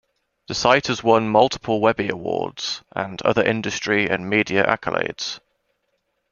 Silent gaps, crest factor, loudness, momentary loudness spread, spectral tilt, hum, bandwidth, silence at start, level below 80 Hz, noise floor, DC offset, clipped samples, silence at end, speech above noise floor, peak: none; 22 dB; -20 LUFS; 10 LU; -4.5 dB/octave; none; 7.2 kHz; 0.5 s; -56 dBFS; -72 dBFS; under 0.1%; under 0.1%; 0.95 s; 51 dB; 0 dBFS